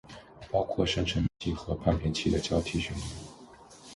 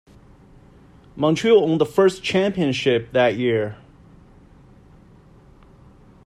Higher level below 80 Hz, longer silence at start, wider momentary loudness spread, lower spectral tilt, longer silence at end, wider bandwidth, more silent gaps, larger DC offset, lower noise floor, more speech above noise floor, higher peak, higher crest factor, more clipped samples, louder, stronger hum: first, -42 dBFS vs -54 dBFS; second, 0.05 s vs 1.15 s; first, 19 LU vs 6 LU; about the same, -5.5 dB/octave vs -6 dB/octave; second, 0 s vs 2.5 s; second, 11.5 kHz vs 14 kHz; neither; neither; about the same, -52 dBFS vs -49 dBFS; second, 22 dB vs 30 dB; second, -12 dBFS vs -4 dBFS; about the same, 20 dB vs 18 dB; neither; second, -30 LUFS vs -19 LUFS; neither